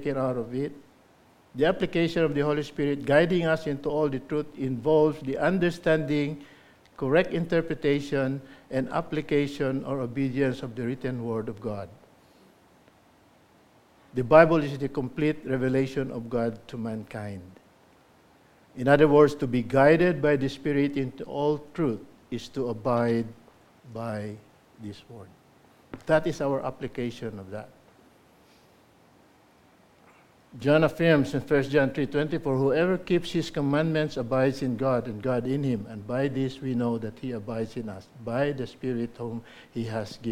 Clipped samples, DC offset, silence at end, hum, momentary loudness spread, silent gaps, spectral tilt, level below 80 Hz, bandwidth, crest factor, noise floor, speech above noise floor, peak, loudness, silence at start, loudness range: under 0.1%; under 0.1%; 0 s; none; 16 LU; none; -7.5 dB/octave; -54 dBFS; 15 kHz; 24 dB; -59 dBFS; 33 dB; -2 dBFS; -26 LUFS; 0 s; 9 LU